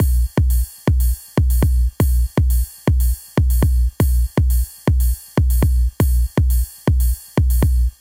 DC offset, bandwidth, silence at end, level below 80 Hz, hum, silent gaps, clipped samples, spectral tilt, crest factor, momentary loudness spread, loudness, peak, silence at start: under 0.1%; 16.5 kHz; 0.1 s; -18 dBFS; 60 Hz at -25 dBFS; none; under 0.1%; -6.5 dB/octave; 10 dB; 3 LU; -19 LUFS; -6 dBFS; 0 s